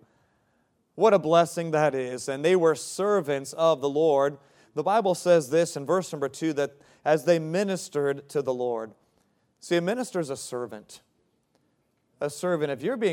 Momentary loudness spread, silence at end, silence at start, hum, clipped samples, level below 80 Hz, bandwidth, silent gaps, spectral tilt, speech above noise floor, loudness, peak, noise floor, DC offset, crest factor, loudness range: 11 LU; 0 s; 0.95 s; none; under 0.1%; -78 dBFS; 16.5 kHz; none; -5 dB/octave; 46 dB; -26 LUFS; -6 dBFS; -71 dBFS; under 0.1%; 20 dB; 8 LU